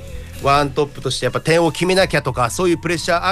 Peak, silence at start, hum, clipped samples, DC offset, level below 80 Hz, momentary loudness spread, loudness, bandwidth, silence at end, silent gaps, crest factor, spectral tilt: -4 dBFS; 0 s; none; under 0.1%; under 0.1%; -36 dBFS; 6 LU; -17 LUFS; 15.5 kHz; 0 s; none; 14 dB; -4.5 dB/octave